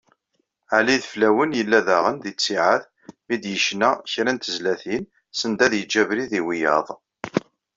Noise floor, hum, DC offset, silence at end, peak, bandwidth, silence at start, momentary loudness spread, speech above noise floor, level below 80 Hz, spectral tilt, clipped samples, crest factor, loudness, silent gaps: -73 dBFS; none; under 0.1%; 0.35 s; -2 dBFS; 7.8 kHz; 0.7 s; 10 LU; 52 dB; -64 dBFS; -3.5 dB/octave; under 0.1%; 20 dB; -21 LUFS; none